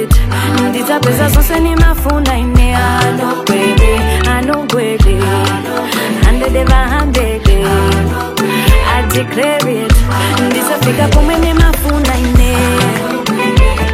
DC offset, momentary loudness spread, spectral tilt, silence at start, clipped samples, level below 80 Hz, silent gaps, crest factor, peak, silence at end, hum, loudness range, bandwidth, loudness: under 0.1%; 3 LU; -5.5 dB/octave; 0 s; 0.2%; -14 dBFS; none; 10 dB; 0 dBFS; 0 s; none; 1 LU; 16 kHz; -12 LUFS